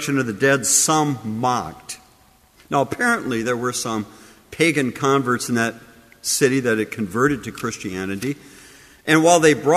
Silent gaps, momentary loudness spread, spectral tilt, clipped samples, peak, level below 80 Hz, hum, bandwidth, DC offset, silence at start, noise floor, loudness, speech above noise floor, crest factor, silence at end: none; 14 LU; -3.5 dB/octave; under 0.1%; -2 dBFS; -56 dBFS; none; 15.5 kHz; under 0.1%; 0 s; -54 dBFS; -20 LUFS; 34 dB; 20 dB; 0 s